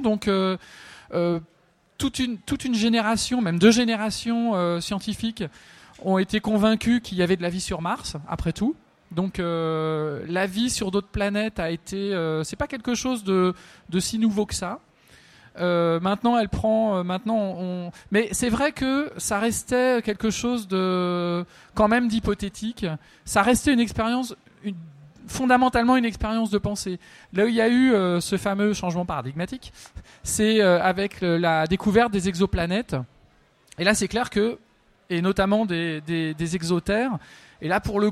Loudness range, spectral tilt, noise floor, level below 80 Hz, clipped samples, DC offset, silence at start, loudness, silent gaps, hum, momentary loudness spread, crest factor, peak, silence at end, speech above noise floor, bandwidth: 4 LU; -5 dB/octave; -58 dBFS; -44 dBFS; under 0.1%; under 0.1%; 0 s; -24 LUFS; none; none; 12 LU; 20 dB; -4 dBFS; 0 s; 35 dB; 14.5 kHz